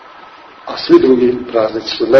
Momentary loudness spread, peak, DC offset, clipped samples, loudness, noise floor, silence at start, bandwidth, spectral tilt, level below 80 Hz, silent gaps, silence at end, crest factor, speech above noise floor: 16 LU; 0 dBFS; under 0.1%; 0.7%; -13 LUFS; -37 dBFS; 0.2 s; 6.4 kHz; -6 dB/octave; -48 dBFS; none; 0 s; 12 dB; 26 dB